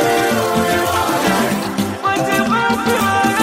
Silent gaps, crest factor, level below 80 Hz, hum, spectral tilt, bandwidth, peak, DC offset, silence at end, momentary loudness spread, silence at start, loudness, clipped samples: none; 14 dB; -44 dBFS; none; -4 dB/octave; 16.5 kHz; -2 dBFS; under 0.1%; 0 s; 3 LU; 0 s; -16 LUFS; under 0.1%